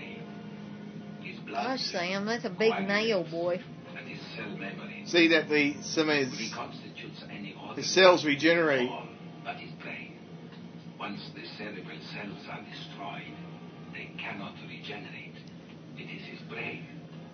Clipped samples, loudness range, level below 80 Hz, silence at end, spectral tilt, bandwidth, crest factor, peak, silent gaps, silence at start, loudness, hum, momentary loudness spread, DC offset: under 0.1%; 14 LU; -76 dBFS; 0 s; -4 dB/octave; 6.6 kHz; 26 dB; -6 dBFS; none; 0 s; -29 LUFS; none; 20 LU; under 0.1%